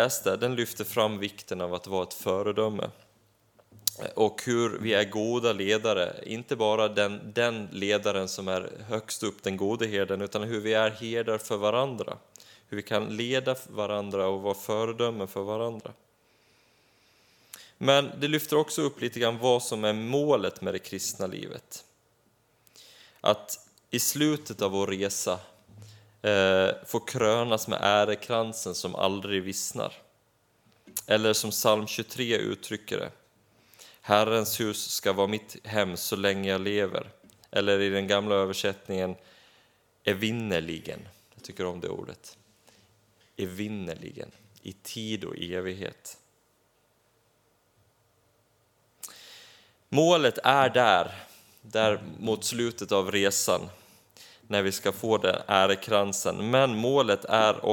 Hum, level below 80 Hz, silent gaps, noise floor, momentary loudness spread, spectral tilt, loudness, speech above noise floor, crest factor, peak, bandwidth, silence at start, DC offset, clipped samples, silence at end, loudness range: none; -70 dBFS; none; -68 dBFS; 15 LU; -3.5 dB/octave; -28 LUFS; 41 dB; 26 dB; -4 dBFS; 19 kHz; 0 s; under 0.1%; under 0.1%; 0 s; 11 LU